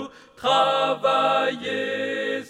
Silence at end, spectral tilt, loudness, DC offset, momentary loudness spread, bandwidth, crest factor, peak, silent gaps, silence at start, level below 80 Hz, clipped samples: 0 s; -3.5 dB/octave; -22 LUFS; under 0.1%; 8 LU; 12 kHz; 16 dB; -8 dBFS; none; 0 s; -70 dBFS; under 0.1%